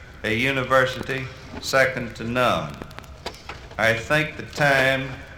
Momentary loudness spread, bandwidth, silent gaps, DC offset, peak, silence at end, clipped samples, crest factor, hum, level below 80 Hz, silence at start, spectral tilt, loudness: 17 LU; 17.5 kHz; none; under 0.1%; -4 dBFS; 0 s; under 0.1%; 20 dB; none; -46 dBFS; 0 s; -4.5 dB/octave; -22 LUFS